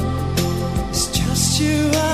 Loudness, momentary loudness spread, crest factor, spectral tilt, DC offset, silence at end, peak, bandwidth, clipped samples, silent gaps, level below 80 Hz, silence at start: -19 LUFS; 5 LU; 14 dB; -4 dB/octave; 0.8%; 0 s; -4 dBFS; 15.5 kHz; under 0.1%; none; -30 dBFS; 0 s